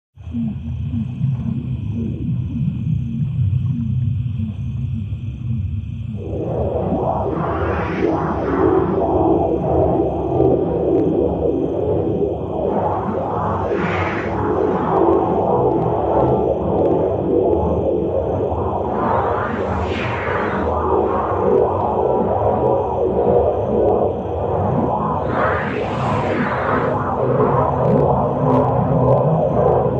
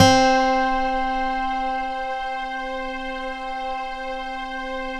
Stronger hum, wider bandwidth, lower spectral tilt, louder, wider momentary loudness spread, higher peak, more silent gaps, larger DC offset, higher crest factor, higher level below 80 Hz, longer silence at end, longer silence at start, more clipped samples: neither; second, 7.2 kHz vs 13 kHz; first, -10 dB/octave vs -4 dB/octave; first, -19 LUFS vs -24 LUFS; second, 8 LU vs 11 LU; about the same, -2 dBFS vs 0 dBFS; neither; neither; second, 16 dB vs 22 dB; about the same, -34 dBFS vs -38 dBFS; about the same, 0 s vs 0 s; first, 0.15 s vs 0 s; neither